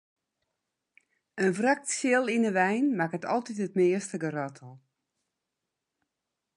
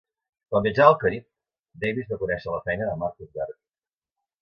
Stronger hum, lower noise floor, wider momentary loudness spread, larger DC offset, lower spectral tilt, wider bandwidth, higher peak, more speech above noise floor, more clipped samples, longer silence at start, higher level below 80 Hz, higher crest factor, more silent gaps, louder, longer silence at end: neither; second, -86 dBFS vs under -90 dBFS; second, 8 LU vs 17 LU; neither; second, -5 dB/octave vs -8 dB/octave; first, 11.5 kHz vs 6.6 kHz; second, -12 dBFS vs 0 dBFS; second, 58 dB vs over 66 dB; neither; first, 1.35 s vs 0.5 s; second, -82 dBFS vs -54 dBFS; about the same, 20 dB vs 24 dB; second, none vs 1.59-1.63 s; second, -28 LUFS vs -24 LUFS; first, 1.8 s vs 0.9 s